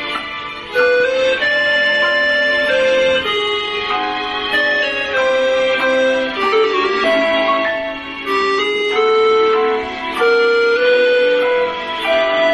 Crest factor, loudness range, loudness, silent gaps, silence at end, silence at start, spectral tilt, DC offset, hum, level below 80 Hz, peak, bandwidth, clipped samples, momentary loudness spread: 12 dB; 2 LU; -15 LUFS; none; 0 s; 0 s; -3 dB/octave; under 0.1%; none; -50 dBFS; -2 dBFS; 12.5 kHz; under 0.1%; 7 LU